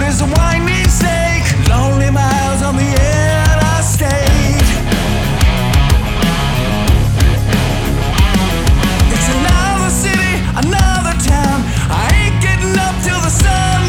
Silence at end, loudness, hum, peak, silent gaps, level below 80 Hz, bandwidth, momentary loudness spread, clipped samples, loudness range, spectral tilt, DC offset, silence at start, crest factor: 0 s; -13 LUFS; none; 0 dBFS; none; -16 dBFS; 17.5 kHz; 3 LU; under 0.1%; 1 LU; -5 dB/octave; under 0.1%; 0 s; 12 dB